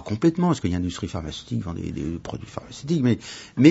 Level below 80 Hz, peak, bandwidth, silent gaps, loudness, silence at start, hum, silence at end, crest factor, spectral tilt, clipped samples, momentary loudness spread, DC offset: -46 dBFS; -2 dBFS; 8 kHz; none; -25 LUFS; 0 s; none; 0 s; 22 dB; -7 dB/octave; under 0.1%; 13 LU; under 0.1%